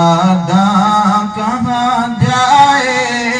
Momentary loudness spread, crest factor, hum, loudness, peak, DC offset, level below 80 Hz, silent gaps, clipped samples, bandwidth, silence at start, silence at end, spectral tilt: 6 LU; 12 dB; none; -11 LUFS; 0 dBFS; under 0.1%; -46 dBFS; none; under 0.1%; 10 kHz; 0 s; 0 s; -5 dB/octave